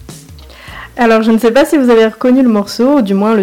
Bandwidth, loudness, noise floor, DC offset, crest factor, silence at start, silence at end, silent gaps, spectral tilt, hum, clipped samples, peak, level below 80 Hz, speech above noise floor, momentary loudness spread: 16.5 kHz; -10 LUFS; -34 dBFS; under 0.1%; 8 dB; 0.1 s; 0 s; none; -6 dB/octave; none; under 0.1%; -2 dBFS; -42 dBFS; 25 dB; 10 LU